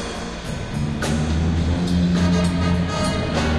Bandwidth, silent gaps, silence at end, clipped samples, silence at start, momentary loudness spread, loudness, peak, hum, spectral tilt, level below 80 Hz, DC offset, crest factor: 12 kHz; none; 0 s; under 0.1%; 0 s; 10 LU; -21 LUFS; -6 dBFS; none; -6 dB/octave; -32 dBFS; under 0.1%; 14 dB